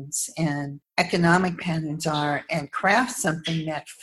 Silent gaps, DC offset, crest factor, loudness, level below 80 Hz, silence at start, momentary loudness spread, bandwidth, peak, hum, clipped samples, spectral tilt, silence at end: none; under 0.1%; 20 dB; -24 LUFS; -58 dBFS; 0 s; 9 LU; 13 kHz; -4 dBFS; none; under 0.1%; -4.5 dB/octave; 0 s